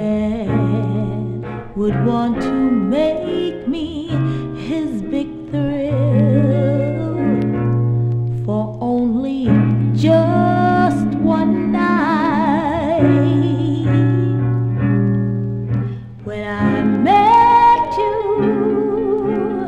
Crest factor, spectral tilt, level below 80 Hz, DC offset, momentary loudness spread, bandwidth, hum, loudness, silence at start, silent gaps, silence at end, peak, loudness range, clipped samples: 14 dB; -9 dB/octave; -40 dBFS; under 0.1%; 9 LU; 7.8 kHz; none; -17 LUFS; 0 s; none; 0 s; -2 dBFS; 4 LU; under 0.1%